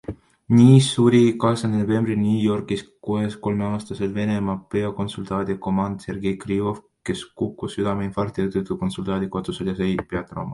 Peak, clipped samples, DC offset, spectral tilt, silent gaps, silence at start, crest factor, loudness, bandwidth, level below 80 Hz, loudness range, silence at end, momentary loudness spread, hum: -2 dBFS; under 0.1%; under 0.1%; -7 dB/octave; none; 0.1 s; 20 dB; -22 LUFS; 11.5 kHz; -48 dBFS; 8 LU; 0 s; 13 LU; none